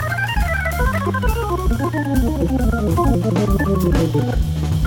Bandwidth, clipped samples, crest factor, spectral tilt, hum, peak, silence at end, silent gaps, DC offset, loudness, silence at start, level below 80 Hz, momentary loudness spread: 19 kHz; under 0.1%; 12 dB; -7 dB/octave; none; -4 dBFS; 0 s; none; under 0.1%; -19 LUFS; 0 s; -22 dBFS; 3 LU